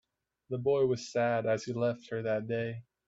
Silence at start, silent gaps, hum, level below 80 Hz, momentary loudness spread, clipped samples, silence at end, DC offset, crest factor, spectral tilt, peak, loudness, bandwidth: 0.5 s; none; none; -72 dBFS; 7 LU; under 0.1%; 0.25 s; under 0.1%; 14 dB; -6.5 dB/octave; -18 dBFS; -32 LUFS; 7.8 kHz